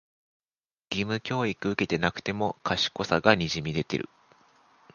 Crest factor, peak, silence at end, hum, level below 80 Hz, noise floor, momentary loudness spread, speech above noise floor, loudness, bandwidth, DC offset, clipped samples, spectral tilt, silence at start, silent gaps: 28 dB; -2 dBFS; 0.9 s; none; -54 dBFS; under -90 dBFS; 9 LU; over 63 dB; -27 LUFS; 7.2 kHz; under 0.1%; under 0.1%; -5 dB/octave; 0.9 s; none